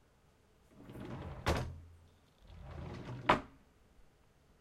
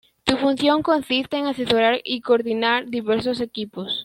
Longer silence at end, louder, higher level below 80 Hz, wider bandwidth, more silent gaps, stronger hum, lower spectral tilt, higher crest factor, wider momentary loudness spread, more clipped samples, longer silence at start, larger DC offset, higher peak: first, 0.55 s vs 0 s; second, -38 LUFS vs -21 LUFS; about the same, -52 dBFS vs -56 dBFS; about the same, 16 kHz vs 16.5 kHz; neither; neither; about the same, -5.5 dB/octave vs -4.5 dB/octave; first, 30 dB vs 20 dB; first, 25 LU vs 7 LU; neither; first, 0.7 s vs 0.25 s; neither; second, -12 dBFS vs -2 dBFS